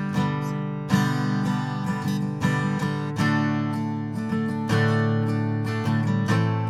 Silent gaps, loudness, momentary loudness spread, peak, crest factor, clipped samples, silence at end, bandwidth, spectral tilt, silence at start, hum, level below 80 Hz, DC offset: none; -25 LUFS; 5 LU; -8 dBFS; 16 dB; under 0.1%; 0 s; 14.5 kHz; -7 dB/octave; 0 s; none; -58 dBFS; under 0.1%